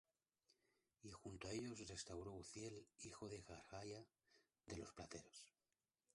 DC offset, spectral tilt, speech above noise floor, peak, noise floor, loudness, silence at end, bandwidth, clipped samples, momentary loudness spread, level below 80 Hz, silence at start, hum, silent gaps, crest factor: under 0.1%; -4 dB/octave; over 35 dB; -38 dBFS; under -90 dBFS; -56 LUFS; 0.65 s; 11.5 kHz; under 0.1%; 11 LU; -74 dBFS; 1.05 s; none; none; 20 dB